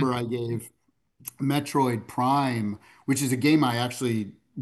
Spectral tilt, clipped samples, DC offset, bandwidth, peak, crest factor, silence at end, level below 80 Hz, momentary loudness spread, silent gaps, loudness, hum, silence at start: -5.5 dB/octave; under 0.1%; under 0.1%; 13 kHz; -8 dBFS; 18 dB; 0 s; -66 dBFS; 13 LU; none; -26 LUFS; none; 0 s